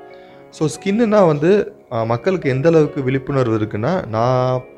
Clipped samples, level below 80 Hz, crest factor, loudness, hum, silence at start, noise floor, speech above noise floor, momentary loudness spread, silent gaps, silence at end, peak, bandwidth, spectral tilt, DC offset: under 0.1%; -50 dBFS; 16 dB; -17 LUFS; none; 0 s; -40 dBFS; 24 dB; 8 LU; none; 0.1 s; -2 dBFS; 12 kHz; -7.5 dB/octave; under 0.1%